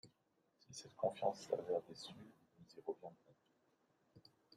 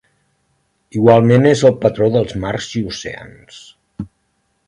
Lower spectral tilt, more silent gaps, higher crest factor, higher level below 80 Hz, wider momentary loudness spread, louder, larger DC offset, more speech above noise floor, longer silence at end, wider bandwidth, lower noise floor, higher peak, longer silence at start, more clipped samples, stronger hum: second, -4.5 dB/octave vs -6.5 dB/octave; neither; first, 24 dB vs 16 dB; second, -88 dBFS vs -46 dBFS; second, 19 LU vs 22 LU; second, -45 LUFS vs -14 LUFS; neither; second, 37 dB vs 51 dB; second, 0.35 s vs 0.6 s; first, 13.5 kHz vs 11 kHz; first, -81 dBFS vs -65 dBFS; second, -24 dBFS vs 0 dBFS; second, 0.05 s vs 0.95 s; neither; neither